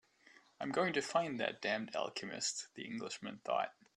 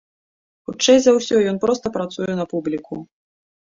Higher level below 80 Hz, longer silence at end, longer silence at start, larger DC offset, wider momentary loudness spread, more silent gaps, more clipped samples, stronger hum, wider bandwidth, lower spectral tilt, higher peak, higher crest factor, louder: second, -84 dBFS vs -58 dBFS; second, 0.25 s vs 0.65 s; about the same, 0.6 s vs 0.7 s; neither; second, 10 LU vs 20 LU; neither; neither; neither; first, 12 kHz vs 7.8 kHz; about the same, -3 dB/octave vs -4 dB/octave; second, -20 dBFS vs -2 dBFS; about the same, 20 dB vs 18 dB; second, -39 LUFS vs -19 LUFS